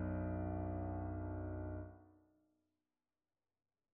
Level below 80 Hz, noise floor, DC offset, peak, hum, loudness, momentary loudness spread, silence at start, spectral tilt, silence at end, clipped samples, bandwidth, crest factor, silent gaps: -56 dBFS; under -90 dBFS; under 0.1%; -32 dBFS; none; -44 LUFS; 9 LU; 0 s; -7.5 dB/octave; 1.8 s; under 0.1%; 2.7 kHz; 14 dB; none